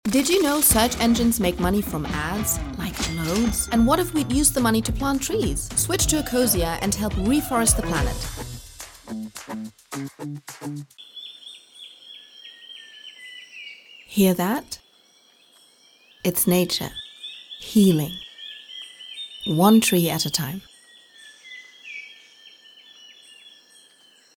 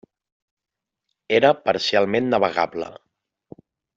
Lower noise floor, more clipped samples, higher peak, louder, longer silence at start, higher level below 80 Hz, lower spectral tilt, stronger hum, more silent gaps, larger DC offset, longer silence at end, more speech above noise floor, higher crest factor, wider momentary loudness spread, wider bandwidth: second, -57 dBFS vs -79 dBFS; neither; about the same, -4 dBFS vs -4 dBFS; about the same, -21 LUFS vs -20 LUFS; second, 0.05 s vs 1.3 s; first, -38 dBFS vs -66 dBFS; about the same, -4 dB/octave vs -5 dB/octave; neither; neither; neither; second, 0.85 s vs 1.05 s; second, 35 dB vs 59 dB; about the same, 20 dB vs 20 dB; first, 22 LU vs 10 LU; first, 18.5 kHz vs 7.8 kHz